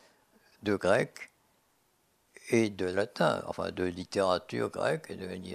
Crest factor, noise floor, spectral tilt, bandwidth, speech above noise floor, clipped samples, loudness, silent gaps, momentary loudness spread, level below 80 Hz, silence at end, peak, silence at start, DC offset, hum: 22 dB; -71 dBFS; -5.5 dB/octave; 14.5 kHz; 40 dB; under 0.1%; -31 LUFS; none; 12 LU; -68 dBFS; 0 s; -12 dBFS; 0.6 s; under 0.1%; none